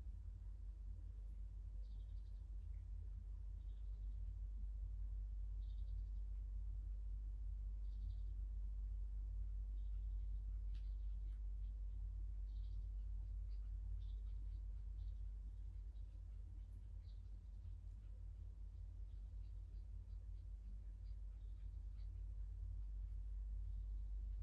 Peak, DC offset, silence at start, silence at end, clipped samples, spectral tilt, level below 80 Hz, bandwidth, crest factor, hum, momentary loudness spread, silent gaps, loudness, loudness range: -38 dBFS; under 0.1%; 0 s; 0 s; under 0.1%; -8 dB/octave; -48 dBFS; 3.9 kHz; 10 dB; none; 6 LU; none; -53 LUFS; 6 LU